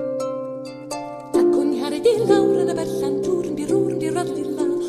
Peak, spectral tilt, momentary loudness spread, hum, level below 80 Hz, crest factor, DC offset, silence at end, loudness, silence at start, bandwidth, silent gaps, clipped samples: -4 dBFS; -6 dB/octave; 14 LU; none; -56 dBFS; 16 dB; under 0.1%; 0 s; -21 LUFS; 0 s; 13.5 kHz; none; under 0.1%